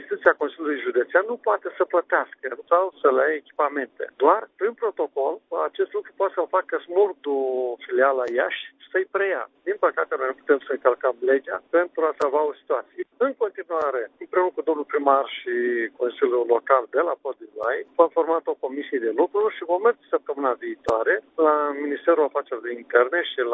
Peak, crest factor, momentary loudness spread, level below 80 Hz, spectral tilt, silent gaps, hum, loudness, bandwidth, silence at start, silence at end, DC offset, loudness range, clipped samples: -2 dBFS; 20 dB; 8 LU; -70 dBFS; -5 dB/octave; none; none; -23 LUFS; 8 kHz; 0 s; 0 s; under 0.1%; 2 LU; under 0.1%